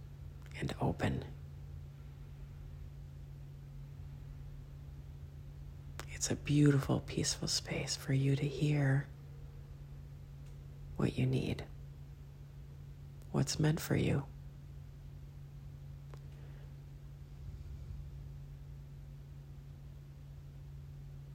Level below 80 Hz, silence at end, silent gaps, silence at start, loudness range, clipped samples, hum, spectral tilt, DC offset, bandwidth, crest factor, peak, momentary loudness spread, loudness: -54 dBFS; 0 s; none; 0 s; 17 LU; under 0.1%; none; -5.5 dB/octave; under 0.1%; 16 kHz; 22 dB; -16 dBFS; 19 LU; -36 LUFS